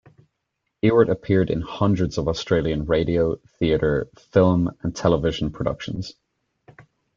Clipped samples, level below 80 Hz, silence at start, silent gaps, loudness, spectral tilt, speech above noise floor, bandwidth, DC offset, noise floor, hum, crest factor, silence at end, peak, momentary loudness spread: under 0.1%; -42 dBFS; 0.85 s; none; -22 LUFS; -7 dB/octave; 57 dB; 7.6 kHz; under 0.1%; -78 dBFS; none; 20 dB; 0.35 s; -2 dBFS; 8 LU